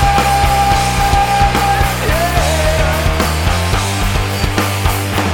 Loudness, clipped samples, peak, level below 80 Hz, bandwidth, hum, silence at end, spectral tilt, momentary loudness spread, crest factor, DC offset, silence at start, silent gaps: -14 LUFS; under 0.1%; 0 dBFS; -20 dBFS; 17.5 kHz; none; 0 s; -4 dB/octave; 4 LU; 12 dB; under 0.1%; 0 s; none